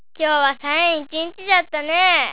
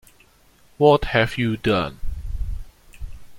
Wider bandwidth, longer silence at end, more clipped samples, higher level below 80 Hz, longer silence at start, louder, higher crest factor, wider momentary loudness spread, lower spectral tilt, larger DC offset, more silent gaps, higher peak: second, 4 kHz vs 16.5 kHz; about the same, 0 s vs 0 s; neither; second, -62 dBFS vs -34 dBFS; second, 0.2 s vs 0.8 s; first, -18 LUFS vs -21 LUFS; about the same, 18 dB vs 20 dB; second, 9 LU vs 24 LU; second, -4.5 dB/octave vs -6.5 dB/octave; first, 1% vs under 0.1%; neither; about the same, -2 dBFS vs -2 dBFS